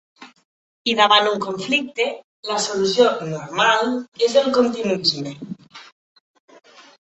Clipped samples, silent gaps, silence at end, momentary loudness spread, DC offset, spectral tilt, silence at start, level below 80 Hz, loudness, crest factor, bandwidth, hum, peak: under 0.1%; 0.45-0.85 s, 2.24-2.43 s, 4.08-4.12 s; 1.15 s; 13 LU; under 0.1%; -3 dB/octave; 0.2 s; -66 dBFS; -19 LUFS; 20 dB; 8.4 kHz; none; 0 dBFS